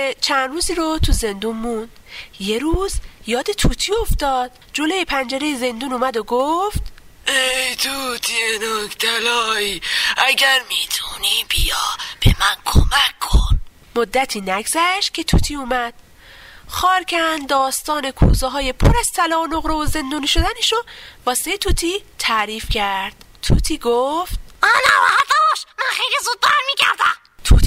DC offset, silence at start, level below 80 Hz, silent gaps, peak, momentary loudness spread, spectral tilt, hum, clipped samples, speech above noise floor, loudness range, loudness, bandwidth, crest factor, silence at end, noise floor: under 0.1%; 0 s; -24 dBFS; none; -2 dBFS; 9 LU; -3.5 dB/octave; none; under 0.1%; 24 dB; 5 LU; -18 LUFS; 16 kHz; 16 dB; 0 s; -42 dBFS